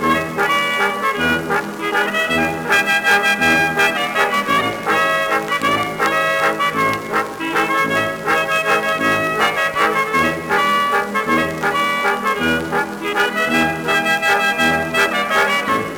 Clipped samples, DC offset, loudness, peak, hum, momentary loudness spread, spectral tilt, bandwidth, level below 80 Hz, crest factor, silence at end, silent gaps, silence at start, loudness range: under 0.1%; under 0.1%; -16 LUFS; -2 dBFS; none; 5 LU; -3.5 dB/octave; over 20 kHz; -52 dBFS; 16 dB; 0 s; none; 0 s; 2 LU